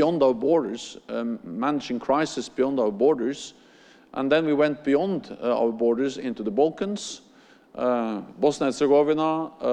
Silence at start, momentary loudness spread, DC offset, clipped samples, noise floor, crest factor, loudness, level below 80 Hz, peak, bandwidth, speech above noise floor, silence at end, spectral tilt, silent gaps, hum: 0 s; 12 LU; under 0.1%; under 0.1%; -54 dBFS; 16 dB; -24 LUFS; -64 dBFS; -8 dBFS; 9.8 kHz; 30 dB; 0 s; -5.5 dB/octave; none; none